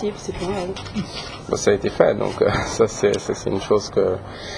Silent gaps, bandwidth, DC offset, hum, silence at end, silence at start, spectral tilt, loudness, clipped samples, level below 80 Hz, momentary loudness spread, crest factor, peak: none; 10.5 kHz; under 0.1%; none; 0 s; 0 s; -5 dB/octave; -21 LUFS; under 0.1%; -42 dBFS; 10 LU; 20 dB; 0 dBFS